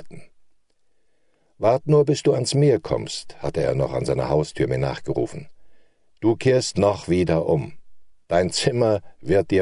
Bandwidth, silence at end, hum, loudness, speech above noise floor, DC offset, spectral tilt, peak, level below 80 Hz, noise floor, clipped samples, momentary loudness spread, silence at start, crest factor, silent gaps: 11 kHz; 0 s; none; -22 LUFS; 49 dB; under 0.1%; -6 dB/octave; -4 dBFS; -46 dBFS; -70 dBFS; under 0.1%; 8 LU; 0 s; 18 dB; none